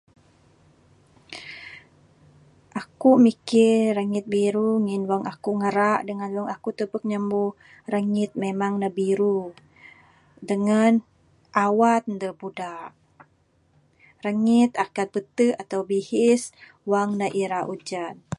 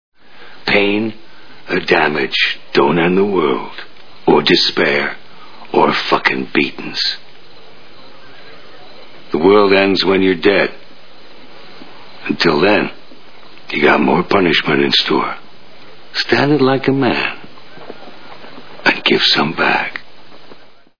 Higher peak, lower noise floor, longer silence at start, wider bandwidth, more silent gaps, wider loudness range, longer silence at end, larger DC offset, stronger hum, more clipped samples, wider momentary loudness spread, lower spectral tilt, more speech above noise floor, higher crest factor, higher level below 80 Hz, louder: second, -4 dBFS vs 0 dBFS; first, -63 dBFS vs -42 dBFS; first, 1.3 s vs 0.1 s; first, 11.5 kHz vs 5.4 kHz; neither; about the same, 5 LU vs 4 LU; about the same, 0.05 s vs 0 s; second, under 0.1% vs 3%; neither; neither; first, 17 LU vs 13 LU; about the same, -6 dB/octave vs -5.5 dB/octave; first, 41 dB vs 29 dB; about the same, 20 dB vs 16 dB; second, -68 dBFS vs -52 dBFS; second, -23 LUFS vs -14 LUFS